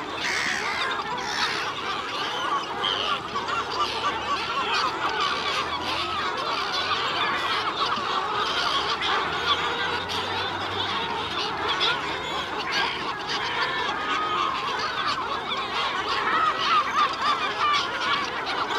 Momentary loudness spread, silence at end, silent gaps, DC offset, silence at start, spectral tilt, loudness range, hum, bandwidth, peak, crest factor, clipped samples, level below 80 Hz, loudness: 5 LU; 0 s; none; under 0.1%; 0 s; -2 dB/octave; 2 LU; none; 16 kHz; -10 dBFS; 16 dB; under 0.1%; -56 dBFS; -25 LUFS